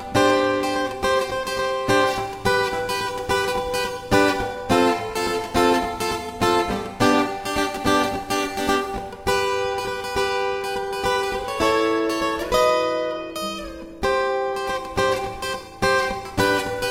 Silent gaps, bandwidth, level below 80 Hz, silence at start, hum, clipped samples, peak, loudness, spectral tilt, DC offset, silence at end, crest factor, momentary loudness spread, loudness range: none; 16.5 kHz; -42 dBFS; 0 s; none; under 0.1%; -4 dBFS; -22 LUFS; -4 dB/octave; under 0.1%; 0 s; 18 dB; 7 LU; 2 LU